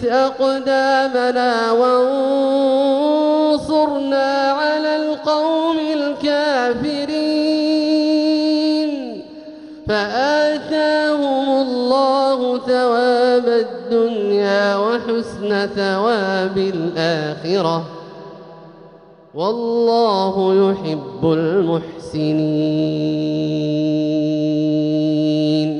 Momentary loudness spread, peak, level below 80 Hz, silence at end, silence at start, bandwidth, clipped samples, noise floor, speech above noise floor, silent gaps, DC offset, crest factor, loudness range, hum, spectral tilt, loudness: 7 LU; -4 dBFS; -56 dBFS; 0 s; 0 s; 10.5 kHz; under 0.1%; -44 dBFS; 27 dB; none; under 0.1%; 14 dB; 4 LU; none; -6 dB/octave; -17 LUFS